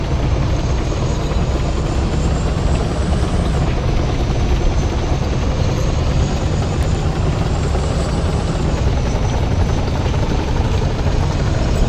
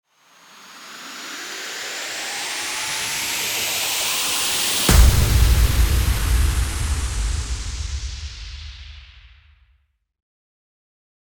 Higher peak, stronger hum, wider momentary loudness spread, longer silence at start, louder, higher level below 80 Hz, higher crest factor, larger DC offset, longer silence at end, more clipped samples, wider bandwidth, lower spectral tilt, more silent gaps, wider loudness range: about the same, -4 dBFS vs -2 dBFS; neither; second, 1 LU vs 19 LU; second, 0 s vs 0.55 s; about the same, -18 LUFS vs -20 LUFS; about the same, -20 dBFS vs -24 dBFS; second, 12 dB vs 20 dB; neither; second, 0 s vs 2.05 s; neither; second, 10 kHz vs over 20 kHz; first, -6.5 dB/octave vs -3 dB/octave; neither; second, 0 LU vs 16 LU